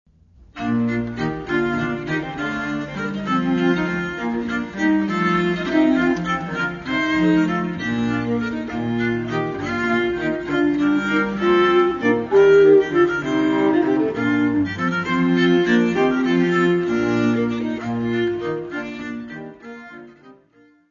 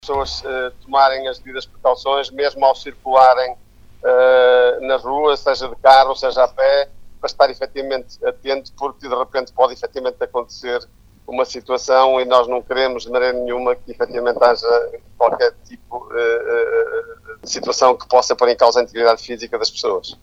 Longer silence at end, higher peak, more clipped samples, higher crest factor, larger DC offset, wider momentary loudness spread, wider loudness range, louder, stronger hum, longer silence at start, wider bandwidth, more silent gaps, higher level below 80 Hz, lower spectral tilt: first, 0.6 s vs 0.1 s; second, -4 dBFS vs 0 dBFS; neither; about the same, 16 dB vs 16 dB; neither; second, 10 LU vs 14 LU; about the same, 7 LU vs 6 LU; second, -20 LUFS vs -17 LUFS; second, none vs 50 Hz at -60 dBFS; first, 0.55 s vs 0.05 s; about the same, 7.4 kHz vs 8 kHz; neither; about the same, -48 dBFS vs -46 dBFS; first, -7 dB/octave vs -2 dB/octave